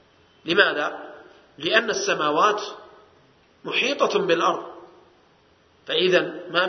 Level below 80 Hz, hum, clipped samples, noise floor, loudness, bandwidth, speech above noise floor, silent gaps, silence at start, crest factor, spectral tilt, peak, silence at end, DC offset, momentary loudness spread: -72 dBFS; none; under 0.1%; -58 dBFS; -22 LUFS; 6.4 kHz; 36 dB; none; 0.45 s; 24 dB; -3 dB/octave; 0 dBFS; 0 s; under 0.1%; 19 LU